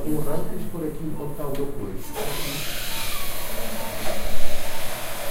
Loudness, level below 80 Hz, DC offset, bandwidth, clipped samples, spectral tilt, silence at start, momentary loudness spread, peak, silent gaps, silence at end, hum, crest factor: -30 LUFS; -32 dBFS; under 0.1%; 16 kHz; under 0.1%; -4 dB/octave; 0 s; 4 LU; -2 dBFS; none; 0 s; none; 16 dB